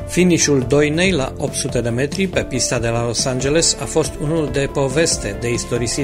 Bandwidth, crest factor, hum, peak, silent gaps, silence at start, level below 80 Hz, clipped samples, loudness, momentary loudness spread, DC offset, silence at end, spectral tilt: 16 kHz; 16 dB; none; -2 dBFS; none; 0 s; -34 dBFS; under 0.1%; -17 LUFS; 6 LU; under 0.1%; 0 s; -4 dB/octave